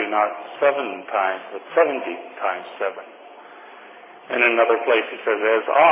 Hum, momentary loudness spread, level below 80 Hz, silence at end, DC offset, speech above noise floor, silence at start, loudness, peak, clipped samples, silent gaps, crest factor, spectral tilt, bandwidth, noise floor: none; 15 LU; under -90 dBFS; 0 s; under 0.1%; 23 dB; 0 s; -21 LUFS; -2 dBFS; under 0.1%; none; 18 dB; -6.5 dB/octave; 3.9 kHz; -43 dBFS